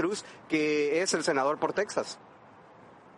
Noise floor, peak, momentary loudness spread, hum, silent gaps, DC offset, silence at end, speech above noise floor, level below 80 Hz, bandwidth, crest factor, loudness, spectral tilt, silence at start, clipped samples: -54 dBFS; -14 dBFS; 11 LU; none; none; under 0.1%; 1 s; 25 dB; -76 dBFS; 11.5 kHz; 16 dB; -29 LUFS; -3.5 dB/octave; 0 s; under 0.1%